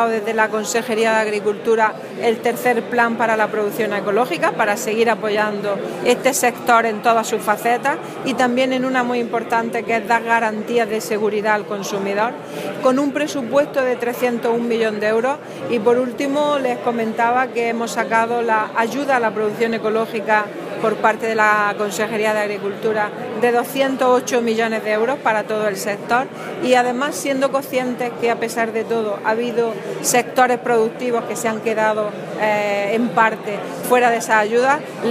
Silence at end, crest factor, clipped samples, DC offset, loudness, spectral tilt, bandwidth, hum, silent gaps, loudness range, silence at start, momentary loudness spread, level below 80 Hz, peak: 0 s; 18 dB; under 0.1%; under 0.1%; -19 LUFS; -4 dB/octave; 15.5 kHz; none; none; 2 LU; 0 s; 6 LU; -72 dBFS; -2 dBFS